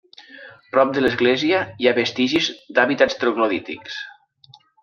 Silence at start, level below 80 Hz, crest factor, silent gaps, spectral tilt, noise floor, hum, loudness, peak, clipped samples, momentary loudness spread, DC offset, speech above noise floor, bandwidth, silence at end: 0.2 s; -60 dBFS; 20 dB; none; -4.5 dB/octave; -52 dBFS; none; -19 LUFS; 0 dBFS; under 0.1%; 14 LU; under 0.1%; 33 dB; 7.2 kHz; 0.7 s